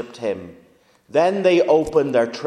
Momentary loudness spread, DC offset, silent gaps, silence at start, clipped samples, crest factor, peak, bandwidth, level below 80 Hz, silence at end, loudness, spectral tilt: 11 LU; under 0.1%; none; 0 s; under 0.1%; 16 dB; -4 dBFS; 11 kHz; -54 dBFS; 0 s; -18 LUFS; -6 dB/octave